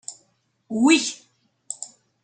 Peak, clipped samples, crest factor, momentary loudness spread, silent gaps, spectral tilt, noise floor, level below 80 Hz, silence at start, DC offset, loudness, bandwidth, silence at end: -4 dBFS; under 0.1%; 20 dB; 21 LU; none; -2 dB/octave; -67 dBFS; -78 dBFS; 0.1 s; under 0.1%; -20 LUFS; 9.4 kHz; 0.35 s